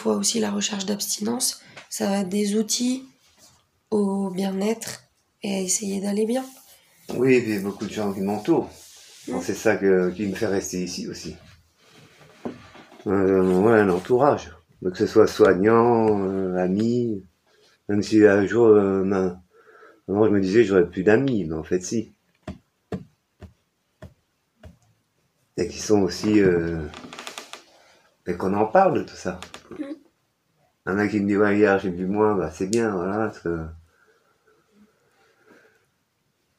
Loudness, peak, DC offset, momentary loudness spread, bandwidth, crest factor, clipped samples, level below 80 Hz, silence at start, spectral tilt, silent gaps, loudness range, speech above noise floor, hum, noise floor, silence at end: -22 LUFS; -2 dBFS; under 0.1%; 19 LU; 15.5 kHz; 20 dB; under 0.1%; -54 dBFS; 0 s; -5 dB/octave; none; 9 LU; 50 dB; none; -71 dBFS; 2.8 s